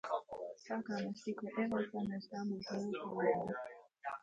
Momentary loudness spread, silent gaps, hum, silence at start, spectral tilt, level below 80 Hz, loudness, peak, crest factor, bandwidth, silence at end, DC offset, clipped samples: 11 LU; none; none; 0.05 s; -6.5 dB/octave; -76 dBFS; -41 LUFS; -22 dBFS; 20 dB; 7.8 kHz; 0 s; under 0.1%; under 0.1%